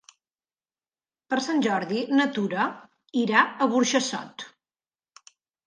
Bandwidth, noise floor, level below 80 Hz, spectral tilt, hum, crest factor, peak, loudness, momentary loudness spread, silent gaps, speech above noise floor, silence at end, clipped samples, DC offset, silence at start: 10 kHz; under -90 dBFS; -78 dBFS; -3.5 dB/octave; none; 22 dB; -6 dBFS; -24 LUFS; 12 LU; none; over 66 dB; 1.2 s; under 0.1%; under 0.1%; 1.3 s